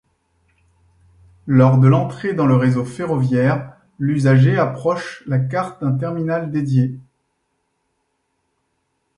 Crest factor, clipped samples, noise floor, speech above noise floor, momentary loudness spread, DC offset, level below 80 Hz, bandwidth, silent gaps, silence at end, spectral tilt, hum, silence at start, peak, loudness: 18 dB; under 0.1%; -70 dBFS; 54 dB; 11 LU; under 0.1%; -56 dBFS; 10.5 kHz; none; 2.15 s; -9 dB/octave; none; 1.45 s; -2 dBFS; -18 LUFS